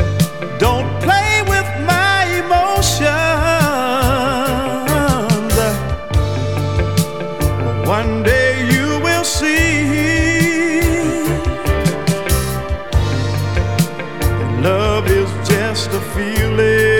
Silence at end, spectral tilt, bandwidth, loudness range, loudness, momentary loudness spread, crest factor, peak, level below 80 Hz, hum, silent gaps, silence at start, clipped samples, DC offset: 0 s; -5 dB/octave; 20 kHz; 3 LU; -15 LUFS; 6 LU; 16 dB; 0 dBFS; -26 dBFS; none; none; 0 s; under 0.1%; 2%